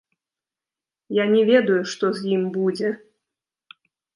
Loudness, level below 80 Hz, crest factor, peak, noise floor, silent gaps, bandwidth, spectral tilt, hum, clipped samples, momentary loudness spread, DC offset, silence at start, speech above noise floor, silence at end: -21 LUFS; -76 dBFS; 20 dB; -4 dBFS; -90 dBFS; none; 11 kHz; -6 dB/octave; none; under 0.1%; 10 LU; under 0.1%; 1.1 s; 70 dB; 1.2 s